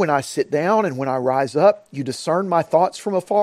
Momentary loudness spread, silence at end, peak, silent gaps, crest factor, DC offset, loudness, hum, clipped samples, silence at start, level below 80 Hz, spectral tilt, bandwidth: 8 LU; 0 s; -2 dBFS; none; 16 dB; under 0.1%; -20 LUFS; none; under 0.1%; 0 s; -66 dBFS; -5.5 dB/octave; 14.5 kHz